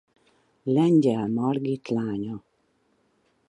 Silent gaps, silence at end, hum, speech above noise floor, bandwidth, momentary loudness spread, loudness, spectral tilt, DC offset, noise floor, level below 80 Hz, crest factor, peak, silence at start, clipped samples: none; 1.1 s; none; 45 dB; 10.5 kHz; 16 LU; -25 LUFS; -8.5 dB/octave; under 0.1%; -68 dBFS; -68 dBFS; 16 dB; -10 dBFS; 0.65 s; under 0.1%